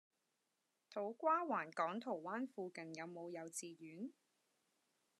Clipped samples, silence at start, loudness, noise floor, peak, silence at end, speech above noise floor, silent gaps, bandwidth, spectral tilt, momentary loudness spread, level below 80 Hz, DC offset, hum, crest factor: under 0.1%; 0.9 s; -44 LUFS; -87 dBFS; -26 dBFS; 1.1 s; 43 dB; none; 13 kHz; -4.5 dB/octave; 14 LU; under -90 dBFS; under 0.1%; none; 20 dB